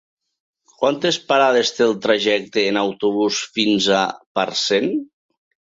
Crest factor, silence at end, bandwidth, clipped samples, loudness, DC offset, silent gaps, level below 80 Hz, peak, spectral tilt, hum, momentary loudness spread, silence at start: 16 dB; 0.65 s; 7.8 kHz; under 0.1%; -18 LUFS; under 0.1%; 4.26-4.35 s; -64 dBFS; -2 dBFS; -3.5 dB/octave; none; 6 LU; 0.8 s